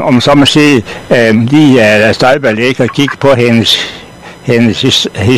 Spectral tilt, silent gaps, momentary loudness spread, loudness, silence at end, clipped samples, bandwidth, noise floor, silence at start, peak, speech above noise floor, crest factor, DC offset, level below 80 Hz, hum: -5 dB/octave; none; 7 LU; -7 LUFS; 0 s; 2%; 14 kHz; -30 dBFS; 0 s; 0 dBFS; 23 dB; 8 dB; 0.7%; -40 dBFS; none